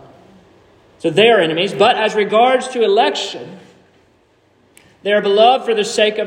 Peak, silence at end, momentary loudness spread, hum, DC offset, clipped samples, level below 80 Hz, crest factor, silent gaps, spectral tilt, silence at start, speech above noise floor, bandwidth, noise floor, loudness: 0 dBFS; 0 s; 12 LU; none; under 0.1%; under 0.1%; -66 dBFS; 16 dB; none; -3.5 dB/octave; 1.05 s; 41 dB; 11 kHz; -55 dBFS; -14 LUFS